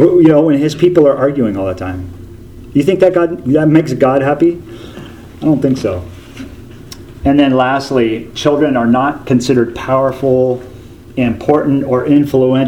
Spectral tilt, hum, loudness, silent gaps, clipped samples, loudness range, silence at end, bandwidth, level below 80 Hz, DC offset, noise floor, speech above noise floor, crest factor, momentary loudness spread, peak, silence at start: -7.5 dB/octave; none; -12 LUFS; none; 0.1%; 3 LU; 0 s; 16 kHz; -38 dBFS; under 0.1%; -32 dBFS; 21 dB; 12 dB; 21 LU; 0 dBFS; 0 s